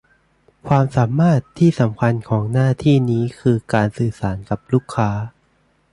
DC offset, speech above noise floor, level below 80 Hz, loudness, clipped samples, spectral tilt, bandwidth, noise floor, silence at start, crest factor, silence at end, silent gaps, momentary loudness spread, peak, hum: under 0.1%; 43 dB; -46 dBFS; -18 LUFS; under 0.1%; -8.5 dB/octave; 11 kHz; -60 dBFS; 0.65 s; 16 dB; 0.65 s; none; 8 LU; -2 dBFS; none